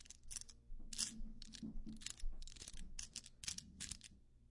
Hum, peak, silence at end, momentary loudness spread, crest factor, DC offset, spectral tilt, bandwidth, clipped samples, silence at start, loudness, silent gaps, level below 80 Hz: none; -26 dBFS; 0.05 s; 12 LU; 24 dB; under 0.1%; -1.5 dB/octave; 11.5 kHz; under 0.1%; 0 s; -50 LUFS; none; -52 dBFS